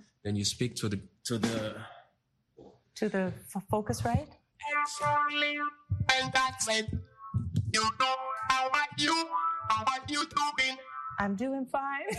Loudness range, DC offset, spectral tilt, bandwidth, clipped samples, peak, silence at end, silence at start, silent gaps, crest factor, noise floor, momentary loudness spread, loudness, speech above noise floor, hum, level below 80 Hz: 6 LU; under 0.1%; -3.5 dB/octave; 12.5 kHz; under 0.1%; -10 dBFS; 0 s; 0.25 s; none; 22 dB; -74 dBFS; 10 LU; -31 LUFS; 43 dB; none; -56 dBFS